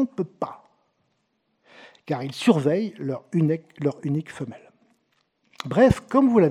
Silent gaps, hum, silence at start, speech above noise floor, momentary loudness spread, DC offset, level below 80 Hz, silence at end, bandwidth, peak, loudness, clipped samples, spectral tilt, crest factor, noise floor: none; none; 0 s; 50 dB; 15 LU; under 0.1%; -52 dBFS; 0 s; 12.5 kHz; -2 dBFS; -23 LUFS; under 0.1%; -7.5 dB/octave; 22 dB; -72 dBFS